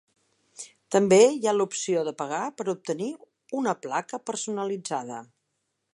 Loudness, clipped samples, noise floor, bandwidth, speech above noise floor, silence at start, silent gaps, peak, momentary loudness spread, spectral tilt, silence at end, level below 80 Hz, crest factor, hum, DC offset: -26 LUFS; under 0.1%; -78 dBFS; 11.5 kHz; 53 dB; 0.6 s; none; -6 dBFS; 21 LU; -4.5 dB/octave; 0.7 s; -78 dBFS; 22 dB; none; under 0.1%